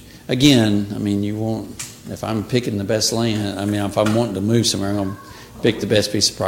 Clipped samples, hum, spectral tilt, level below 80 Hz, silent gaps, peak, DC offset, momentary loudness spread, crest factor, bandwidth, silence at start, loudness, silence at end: under 0.1%; none; -4.5 dB/octave; -46 dBFS; none; 0 dBFS; under 0.1%; 12 LU; 18 dB; 17 kHz; 0 s; -19 LUFS; 0 s